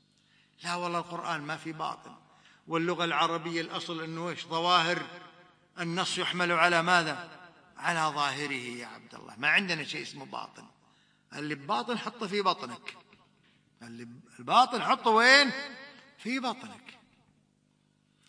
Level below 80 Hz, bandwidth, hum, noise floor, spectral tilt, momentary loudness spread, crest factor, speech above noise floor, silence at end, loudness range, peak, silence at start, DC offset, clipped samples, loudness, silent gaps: -82 dBFS; 10.5 kHz; none; -70 dBFS; -3.5 dB/octave; 22 LU; 26 dB; 40 dB; 1.4 s; 9 LU; -4 dBFS; 0.6 s; under 0.1%; under 0.1%; -28 LUFS; none